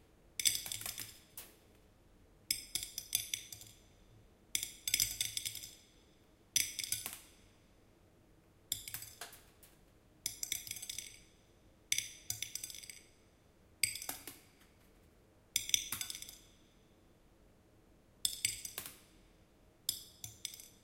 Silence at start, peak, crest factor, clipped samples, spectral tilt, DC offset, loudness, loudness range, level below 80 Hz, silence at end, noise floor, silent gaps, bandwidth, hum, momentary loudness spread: 0.25 s; -8 dBFS; 36 dB; under 0.1%; 1 dB/octave; under 0.1%; -38 LUFS; 6 LU; -68 dBFS; 0.05 s; -66 dBFS; none; 16.5 kHz; none; 19 LU